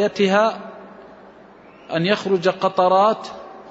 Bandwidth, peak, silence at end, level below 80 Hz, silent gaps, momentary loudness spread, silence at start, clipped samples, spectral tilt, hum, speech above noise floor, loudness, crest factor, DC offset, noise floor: 8 kHz; -4 dBFS; 0 s; -66 dBFS; none; 20 LU; 0 s; under 0.1%; -5.5 dB/octave; none; 27 dB; -19 LUFS; 16 dB; under 0.1%; -45 dBFS